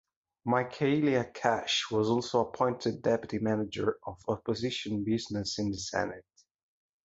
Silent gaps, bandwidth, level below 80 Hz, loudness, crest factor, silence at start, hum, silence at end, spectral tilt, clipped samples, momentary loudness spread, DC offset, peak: none; 8 kHz; -60 dBFS; -31 LUFS; 22 dB; 0.45 s; none; 0.85 s; -5 dB/octave; under 0.1%; 6 LU; under 0.1%; -10 dBFS